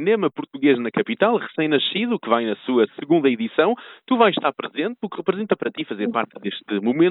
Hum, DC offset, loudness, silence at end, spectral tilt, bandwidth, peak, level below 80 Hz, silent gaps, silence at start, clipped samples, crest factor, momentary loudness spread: none; under 0.1%; -21 LUFS; 0 s; -10 dB/octave; 4.1 kHz; -4 dBFS; -76 dBFS; none; 0 s; under 0.1%; 18 dB; 8 LU